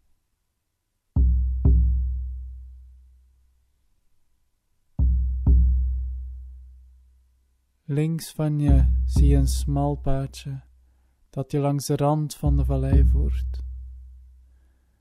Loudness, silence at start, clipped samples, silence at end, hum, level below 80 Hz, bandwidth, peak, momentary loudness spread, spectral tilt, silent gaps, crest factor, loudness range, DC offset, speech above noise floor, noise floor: -23 LUFS; 1.15 s; under 0.1%; 0.8 s; none; -26 dBFS; 13 kHz; -6 dBFS; 18 LU; -7.5 dB/octave; none; 18 dB; 5 LU; under 0.1%; 55 dB; -76 dBFS